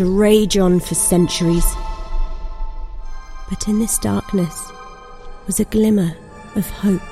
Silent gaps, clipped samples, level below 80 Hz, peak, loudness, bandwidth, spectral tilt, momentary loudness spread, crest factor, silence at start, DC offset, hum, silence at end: none; under 0.1%; -26 dBFS; -2 dBFS; -17 LUFS; 15.5 kHz; -5 dB/octave; 22 LU; 16 dB; 0 s; under 0.1%; none; 0 s